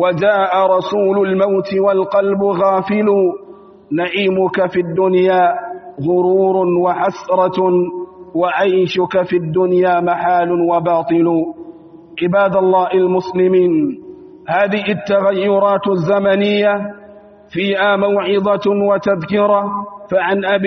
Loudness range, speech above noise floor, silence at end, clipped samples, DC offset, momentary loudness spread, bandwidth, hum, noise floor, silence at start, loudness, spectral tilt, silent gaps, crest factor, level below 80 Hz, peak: 1 LU; 26 dB; 0 s; under 0.1%; under 0.1%; 8 LU; 6.2 kHz; none; -40 dBFS; 0 s; -15 LUFS; -5 dB/octave; none; 12 dB; -58 dBFS; -2 dBFS